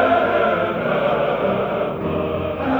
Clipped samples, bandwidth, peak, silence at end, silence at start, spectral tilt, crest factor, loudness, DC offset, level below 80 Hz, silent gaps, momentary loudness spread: under 0.1%; over 20 kHz; -4 dBFS; 0 s; 0 s; -8 dB/octave; 16 dB; -20 LUFS; under 0.1%; -46 dBFS; none; 6 LU